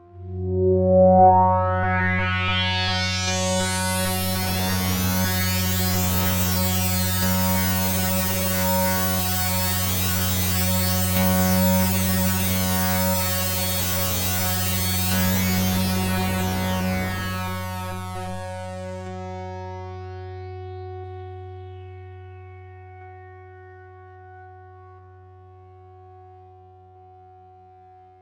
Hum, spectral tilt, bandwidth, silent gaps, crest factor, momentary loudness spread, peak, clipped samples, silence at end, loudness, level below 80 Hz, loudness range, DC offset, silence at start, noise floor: none; -4 dB/octave; 17 kHz; none; 18 dB; 17 LU; -4 dBFS; under 0.1%; 1.7 s; -21 LUFS; -46 dBFS; 17 LU; under 0.1%; 0.15 s; -49 dBFS